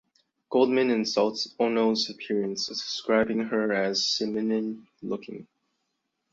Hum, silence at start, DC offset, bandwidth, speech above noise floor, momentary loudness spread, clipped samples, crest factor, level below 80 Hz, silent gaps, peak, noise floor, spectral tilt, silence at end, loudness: none; 0.5 s; under 0.1%; 7.8 kHz; 53 dB; 12 LU; under 0.1%; 18 dB; -68 dBFS; none; -10 dBFS; -79 dBFS; -4 dB/octave; 0.9 s; -26 LUFS